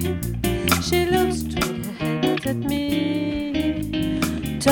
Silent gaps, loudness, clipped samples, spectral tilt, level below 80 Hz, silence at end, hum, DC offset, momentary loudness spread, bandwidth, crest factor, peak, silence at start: none; -23 LUFS; under 0.1%; -5 dB/octave; -36 dBFS; 0 s; none; under 0.1%; 5 LU; 17.5 kHz; 20 dB; -2 dBFS; 0 s